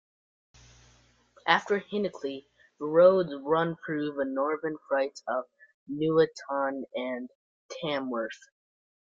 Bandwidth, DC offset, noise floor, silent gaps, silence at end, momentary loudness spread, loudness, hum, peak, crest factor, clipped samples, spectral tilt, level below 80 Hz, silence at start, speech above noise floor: 7.6 kHz; under 0.1%; -63 dBFS; 5.74-5.86 s, 7.35-7.69 s; 0.7 s; 15 LU; -29 LUFS; none; -6 dBFS; 24 dB; under 0.1%; -6 dB/octave; -70 dBFS; 1.45 s; 35 dB